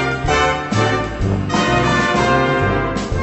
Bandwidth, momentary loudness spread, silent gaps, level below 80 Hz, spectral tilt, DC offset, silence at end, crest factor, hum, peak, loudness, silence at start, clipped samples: 8.4 kHz; 5 LU; none; -30 dBFS; -5.5 dB/octave; under 0.1%; 0 s; 14 dB; none; -2 dBFS; -16 LUFS; 0 s; under 0.1%